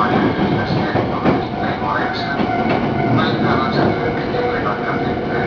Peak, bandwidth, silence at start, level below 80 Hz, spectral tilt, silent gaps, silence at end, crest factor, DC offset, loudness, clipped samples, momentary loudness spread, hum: -2 dBFS; 5.4 kHz; 0 s; -40 dBFS; -8 dB/octave; none; 0 s; 16 dB; under 0.1%; -18 LUFS; under 0.1%; 4 LU; none